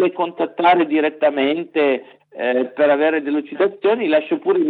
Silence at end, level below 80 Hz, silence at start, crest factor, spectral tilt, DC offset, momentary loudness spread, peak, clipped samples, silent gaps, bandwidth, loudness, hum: 0 s; -86 dBFS; 0 s; 16 dB; -8 dB/octave; under 0.1%; 7 LU; -2 dBFS; under 0.1%; none; 4.6 kHz; -18 LUFS; none